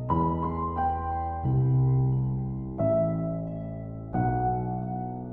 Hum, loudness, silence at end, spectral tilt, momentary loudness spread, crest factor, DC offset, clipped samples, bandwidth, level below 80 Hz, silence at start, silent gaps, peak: none; -28 LUFS; 0 s; -13 dB/octave; 10 LU; 14 dB; 0.2%; under 0.1%; 3.1 kHz; -42 dBFS; 0 s; none; -14 dBFS